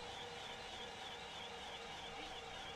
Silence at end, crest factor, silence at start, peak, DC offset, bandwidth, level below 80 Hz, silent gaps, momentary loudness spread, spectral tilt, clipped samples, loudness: 0 s; 14 dB; 0 s; -36 dBFS; under 0.1%; 13 kHz; -68 dBFS; none; 0 LU; -2 dB/octave; under 0.1%; -48 LUFS